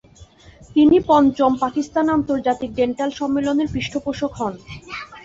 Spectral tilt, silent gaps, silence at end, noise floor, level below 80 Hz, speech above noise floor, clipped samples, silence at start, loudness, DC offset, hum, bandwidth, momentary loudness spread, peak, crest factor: -6 dB/octave; none; 0.05 s; -46 dBFS; -46 dBFS; 28 dB; under 0.1%; 0.2 s; -19 LUFS; under 0.1%; none; 7.8 kHz; 13 LU; -4 dBFS; 16 dB